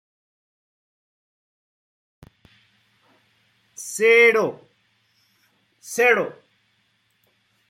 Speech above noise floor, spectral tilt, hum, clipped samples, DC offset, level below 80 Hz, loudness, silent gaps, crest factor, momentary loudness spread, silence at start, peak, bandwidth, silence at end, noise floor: 49 dB; -2.5 dB/octave; none; under 0.1%; under 0.1%; -74 dBFS; -18 LUFS; none; 22 dB; 18 LU; 3.8 s; -4 dBFS; 15.5 kHz; 1.35 s; -67 dBFS